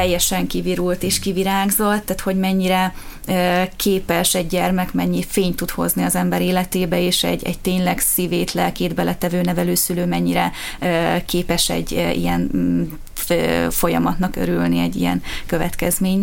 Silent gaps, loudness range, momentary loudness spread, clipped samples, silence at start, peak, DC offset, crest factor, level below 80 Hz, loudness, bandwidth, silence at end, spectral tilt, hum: none; 1 LU; 5 LU; under 0.1%; 0 s; -4 dBFS; under 0.1%; 16 dB; -34 dBFS; -19 LUFS; 17 kHz; 0 s; -4.5 dB/octave; none